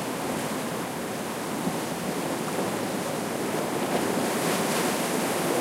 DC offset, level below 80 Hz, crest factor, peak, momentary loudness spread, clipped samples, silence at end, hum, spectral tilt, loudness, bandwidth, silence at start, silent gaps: under 0.1%; -64 dBFS; 14 dB; -14 dBFS; 6 LU; under 0.1%; 0 s; none; -4 dB/octave; -28 LUFS; 16 kHz; 0 s; none